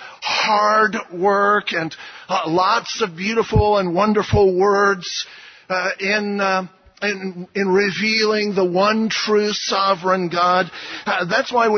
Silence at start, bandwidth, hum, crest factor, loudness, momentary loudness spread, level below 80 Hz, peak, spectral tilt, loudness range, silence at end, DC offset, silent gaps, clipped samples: 0 s; 6.6 kHz; none; 14 dB; -18 LUFS; 9 LU; -40 dBFS; -4 dBFS; -4.5 dB/octave; 2 LU; 0 s; under 0.1%; none; under 0.1%